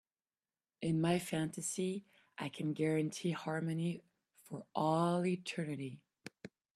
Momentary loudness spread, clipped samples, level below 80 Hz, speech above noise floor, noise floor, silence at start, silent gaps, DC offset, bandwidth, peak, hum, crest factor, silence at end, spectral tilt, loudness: 18 LU; under 0.1%; -76 dBFS; over 53 dB; under -90 dBFS; 0.8 s; none; under 0.1%; 13.5 kHz; -20 dBFS; none; 18 dB; 0.3 s; -5.5 dB/octave; -38 LUFS